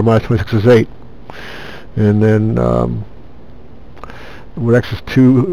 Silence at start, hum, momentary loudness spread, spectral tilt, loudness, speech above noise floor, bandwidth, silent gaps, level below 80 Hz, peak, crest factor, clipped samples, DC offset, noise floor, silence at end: 0 s; none; 23 LU; -8.5 dB/octave; -13 LUFS; 26 dB; 10 kHz; none; -36 dBFS; 0 dBFS; 14 dB; under 0.1%; 3%; -38 dBFS; 0 s